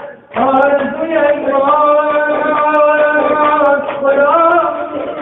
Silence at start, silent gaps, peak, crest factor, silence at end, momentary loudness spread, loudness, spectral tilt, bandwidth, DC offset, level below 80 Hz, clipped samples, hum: 0 s; none; 0 dBFS; 12 dB; 0 s; 6 LU; -12 LUFS; -7.5 dB/octave; 4 kHz; under 0.1%; -52 dBFS; under 0.1%; none